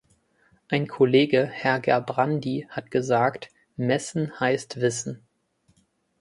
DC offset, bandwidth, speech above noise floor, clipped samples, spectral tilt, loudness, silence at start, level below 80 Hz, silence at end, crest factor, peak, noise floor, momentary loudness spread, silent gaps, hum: under 0.1%; 11.5 kHz; 43 dB; under 0.1%; -5.5 dB/octave; -24 LUFS; 0.7 s; -66 dBFS; 1.05 s; 20 dB; -6 dBFS; -67 dBFS; 12 LU; none; none